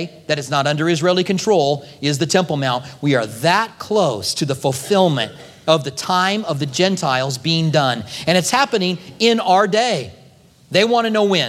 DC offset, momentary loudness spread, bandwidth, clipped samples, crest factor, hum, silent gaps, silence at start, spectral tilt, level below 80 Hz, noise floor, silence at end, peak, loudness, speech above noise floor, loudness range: under 0.1%; 7 LU; 16 kHz; under 0.1%; 18 dB; none; none; 0 s; -4.5 dB/octave; -60 dBFS; -48 dBFS; 0 s; 0 dBFS; -17 LUFS; 31 dB; 2 LU